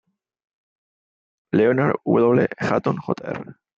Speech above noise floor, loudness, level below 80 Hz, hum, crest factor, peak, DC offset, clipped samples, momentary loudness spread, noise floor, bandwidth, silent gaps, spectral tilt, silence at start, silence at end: over 70 dB; -20 LUFS; -62 dBFS; none; 18 dB; -4 dBFS; under 0.1%; under 0.1%; 10 LU; under -90 dBFS; 7.6 kHz; none; -8.5 dB/octave; 1.55 s; 0.25 s